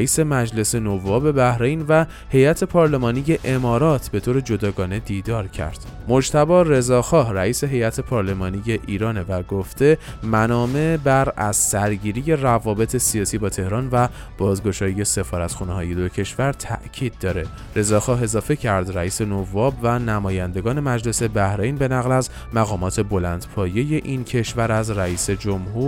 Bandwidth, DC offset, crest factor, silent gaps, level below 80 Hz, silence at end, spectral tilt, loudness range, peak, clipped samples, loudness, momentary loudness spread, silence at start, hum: 17 kHz; under 0.1%; 16 dB; none; -36 dBFS; 0 s; -5.5 dB/octave; 4 LU; -2 dBFS; under 0.1%; -20 LUFS; 8 LU; 0 s; none